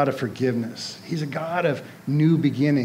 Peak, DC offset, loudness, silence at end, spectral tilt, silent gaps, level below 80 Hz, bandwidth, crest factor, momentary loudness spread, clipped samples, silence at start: -8 dBFS; under 0.1%; -24 LUFS; 0 s; -7 dB/octave; none; -72 dBFS; 15.5 kHz; 16 dB; 11 LU; under 0.1%; 0 s